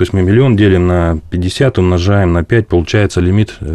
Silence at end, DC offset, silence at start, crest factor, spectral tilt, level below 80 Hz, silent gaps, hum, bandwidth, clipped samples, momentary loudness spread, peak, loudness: 0 s; under 0.1%; 0 s; 10 dB; -7.5 dB/octave; -32 dBFS; none; none; 11 kHz; under 0.1%; 5 LU; 0 dBFS; -12 LUFS